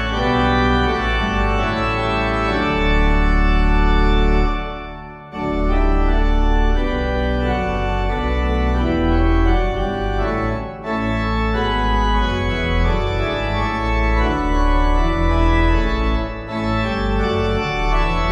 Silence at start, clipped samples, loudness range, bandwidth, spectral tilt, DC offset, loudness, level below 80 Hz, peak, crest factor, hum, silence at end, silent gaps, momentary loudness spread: 0 s; under 0.1%; 2 LU; 7.4 kHz; -7 dB/octave; under 0.1%; -19 LUFS; -20 dBFS; -4 dBFS; 12 dB; none; 0 s; none; 5 LU